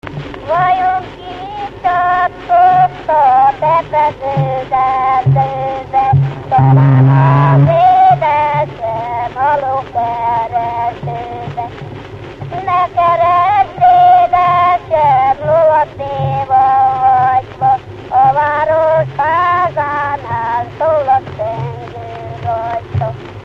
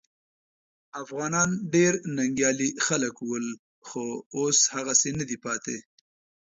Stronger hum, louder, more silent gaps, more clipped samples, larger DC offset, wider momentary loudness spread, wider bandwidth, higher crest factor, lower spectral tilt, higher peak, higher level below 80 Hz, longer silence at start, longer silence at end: neither; first, -12 LUFS vs -25 LUFS; second, none vs 3.59-3.82 s, 4.26-4.31 s; neither; neither; about the same, 14 LU vs 15 LU; second, 6 kHz vs 8 kHz; second, 12 dB vs 20 dB; first, -8.5 dB/octave vs -3 dB/octave; first, 0 dBFS vs -8 dBFS; first, -42 dBFS vs -64 dBFS; second, 0.05 s vs 0.95 s; second, 0 s vs 0.65 s